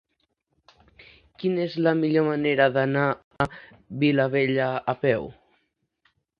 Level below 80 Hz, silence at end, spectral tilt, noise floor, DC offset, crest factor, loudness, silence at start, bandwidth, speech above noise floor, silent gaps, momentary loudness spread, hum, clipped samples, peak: -58 dBFS; 1.05 s; -8.5 dB/octave; -74 dBFS; under 0.1%; 20 dB; -24 LUFS; 1.4 s; 6.2 kHz; 51 dB; 3.24-3.31 s; 8 LU; none; under 0.1%; -6 dBFS